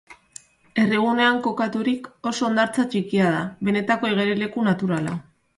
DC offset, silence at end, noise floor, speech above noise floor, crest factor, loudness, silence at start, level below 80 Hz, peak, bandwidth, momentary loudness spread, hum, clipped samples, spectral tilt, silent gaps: under 0.1%; 0.35 s; -48 dBFS; 26 dB; 16 dB; -22 LUFS; 0.1 s; -62 dBFS; -6 dBFS; 11.5 kHz; 9 LU; none; under 0.1%; -5.5 dB/octave; none